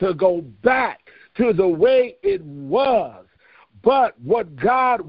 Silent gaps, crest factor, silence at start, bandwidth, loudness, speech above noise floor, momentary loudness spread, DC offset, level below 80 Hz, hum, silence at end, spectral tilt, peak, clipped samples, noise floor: none; 18 dB; 0 s; 5.2 kHz; -19 LUFS; 35 dB; 9 LU; under 0.1%; -54 dBFS; none; 0 s; -10.5 dB/octave; -2 dBFS; under 0.1%; -54 dBFS